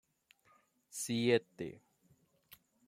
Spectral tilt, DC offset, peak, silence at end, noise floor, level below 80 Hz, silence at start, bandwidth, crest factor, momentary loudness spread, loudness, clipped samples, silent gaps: -4.5 dB/octave; under 0.1%; -16 dBFS; 1.15 s; -72 dBFS; -78 dBFS; 0.95 s; 16.5 kHz; 24 dB; 15 LU; -36 LUFS; under 0.1%; none